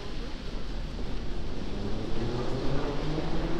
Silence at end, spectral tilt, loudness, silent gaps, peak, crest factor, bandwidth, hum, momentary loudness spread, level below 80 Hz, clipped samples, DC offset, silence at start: 0 s; -6.5 dB/octave; -35 LUFS; none; -14 dBFS; 14 dB; 8.2 kHz; none; 7 LU; -34 dBFS; under 0.1%; under 0.1%; 0 s